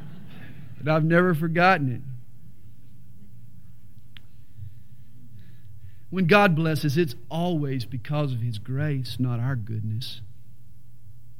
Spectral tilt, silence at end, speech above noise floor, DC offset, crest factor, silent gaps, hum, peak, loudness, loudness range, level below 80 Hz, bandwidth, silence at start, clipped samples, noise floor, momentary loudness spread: -7 dB/octave; 0.3 s; 28 dB; 2%; 26 dB; none; none; -2 dBFS; -24 LUFS; 6 LU; -60 dBFS; 16.5 kHz; 0 s; under 0.1%; -52 dBFS; 25 LU